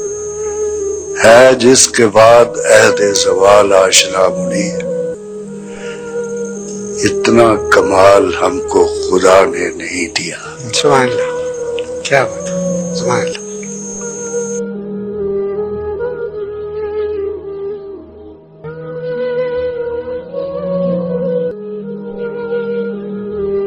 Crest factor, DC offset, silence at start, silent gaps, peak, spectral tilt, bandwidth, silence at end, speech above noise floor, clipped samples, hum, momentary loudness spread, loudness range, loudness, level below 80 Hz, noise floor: 14 dB; under 0.1%; 0 s; none; 0 dBFS; -3.5 dB/octave; over 20 kHz; 0 s; 26 dB; 1%; none; 16 LU; 13 LU; -13 LUFS; -44 dBFS; -35 dBFS